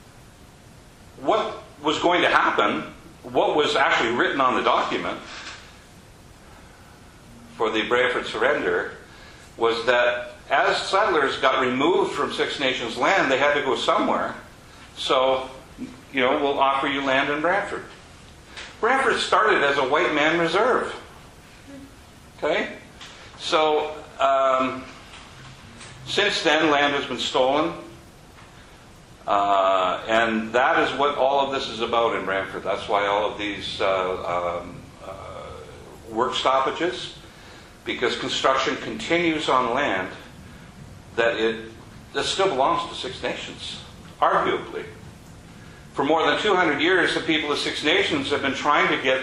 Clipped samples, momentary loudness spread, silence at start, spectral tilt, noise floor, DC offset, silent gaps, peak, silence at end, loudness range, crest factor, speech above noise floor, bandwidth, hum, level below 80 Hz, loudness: under 0.1%; 19 LU; 0 s; -3.5 dB/octave; -48 dBFS; under 0.1%; none; -4 dBFS; 0 s; 5 LU; 20 dB; 26 dB; 12.5 kHz; none; -54 dBFS; -22 LUFS